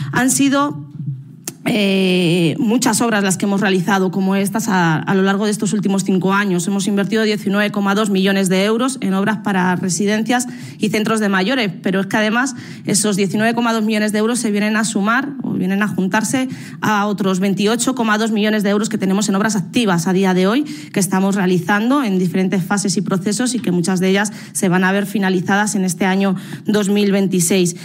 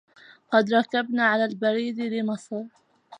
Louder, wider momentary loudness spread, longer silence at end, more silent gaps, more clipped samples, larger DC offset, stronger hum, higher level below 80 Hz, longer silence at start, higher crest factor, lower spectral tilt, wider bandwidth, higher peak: first, -16 LUFS vs -24 LUFS; second, 5 LU vs 13 LU; about the same, 0 s vs 0.05 s; neither; neither; neither; neither; first, -62 dBFS vs -80 dBFS; second, 0 s vs 0.5 s; second, 12 dB vs 20 dB; about the same, -4.5 dB/octave vs -5.5 dB/octave; first, 16.5 kHz vs 10 kHz; about the same, -4 dBFS vs -6 dBFS